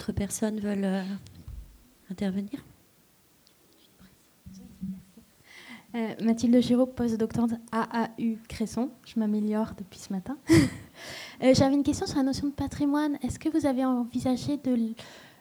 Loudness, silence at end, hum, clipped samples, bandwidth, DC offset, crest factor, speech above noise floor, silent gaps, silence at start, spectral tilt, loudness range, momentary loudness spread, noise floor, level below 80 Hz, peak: -28 LUFS; 0.15 s; none; under 0.1%; over 20 kHz; under 0.1%; 20 dB; 35 dB; none; 0 s; -6 dB/octave; 14 LU; 20 LU; -62 dBFS; -52 dBFS; -8 dBFS